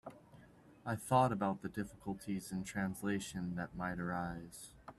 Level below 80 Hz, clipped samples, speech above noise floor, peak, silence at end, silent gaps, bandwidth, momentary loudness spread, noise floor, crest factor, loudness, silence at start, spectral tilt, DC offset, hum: -64 dBFS; under 0.1%; 23 dB; -18 dBFS; 0.05 s; none; 14.5 kHz; 16 LU; -61 dBFS; 22 dB; -39 LUFS; 0.05 s; -6 dB/octave; under 0.1%; none